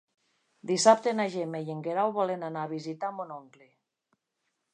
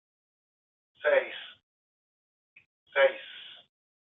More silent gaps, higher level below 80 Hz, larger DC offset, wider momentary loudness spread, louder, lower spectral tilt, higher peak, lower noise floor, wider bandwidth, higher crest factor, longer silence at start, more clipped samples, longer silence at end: second, none vs 1.63-2.56 s, 2.66-2.86 s; about the same, -86 dBFS vs -90 dBFS; neither; second, 18 LU vs 21 LU; about the same, -28 LUFS vs -28 LUFS; first, -4 dB/octave vs 2 dB/octave; first, -6 dBFS vs -12 dBFS; second, -81 dBFS vs under -90 dBFS; first, 11 kHz vs 4 kHz; about the same, 24 dB vs 22 dB; second, 0.65 s vs 1.05 s; neither; first, 1.3 s vs 0.65 s